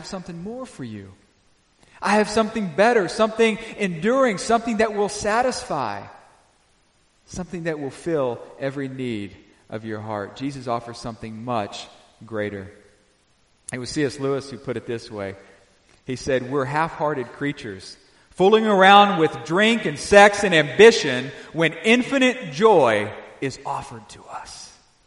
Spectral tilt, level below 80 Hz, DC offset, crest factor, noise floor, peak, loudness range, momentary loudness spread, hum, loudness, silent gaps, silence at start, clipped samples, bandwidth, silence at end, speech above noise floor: -4.5 dB/octave; -54 dBFS; under 0.1%; 22 dB; -61 dBFS; 0 dBFS; 14 LU; 21 LU; none; -20 LUFS; none; 0 s; under 0.1%; 11.5 kHz; 0.4 s; 41 dB